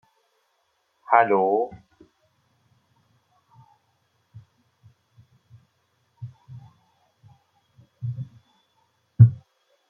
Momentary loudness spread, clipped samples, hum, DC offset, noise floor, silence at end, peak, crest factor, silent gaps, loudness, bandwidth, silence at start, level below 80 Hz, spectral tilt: 28 LU; under 0.1%; none; under 0.1%; -71 dBFS; 0.55 s; 0 dBFS; 26 dB; none; -21 LUFS; 3.4 kHz; 1.1 s; -60 dBFS; -11 dB/octave